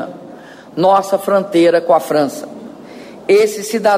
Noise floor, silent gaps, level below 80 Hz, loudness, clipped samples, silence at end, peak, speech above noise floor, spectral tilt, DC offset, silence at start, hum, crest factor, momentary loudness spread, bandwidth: -36 dBFS; none; -62 dBFS; -14 LUFS; under 0.1%; 0 s; -2 dBFS; 23 dB; -5 dB/octave; under 0.1%; 0 s; none; 14 dB; 22 LU; 16 kHz